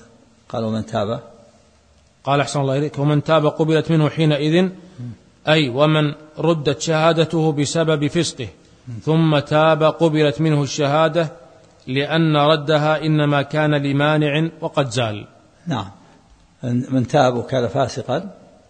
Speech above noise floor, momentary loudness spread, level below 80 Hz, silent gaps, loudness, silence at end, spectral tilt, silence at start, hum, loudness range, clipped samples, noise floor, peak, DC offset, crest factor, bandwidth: 37 dB; 11 LU; -56 dBFS; none; -18 LUFS; 0.35 s; -6 dB/octave; 0.55 s; none; 4 LU; under 0.1%; -54 dBFS; -2 dBFS; under 0.1%; 18 dB; 9.4 kHz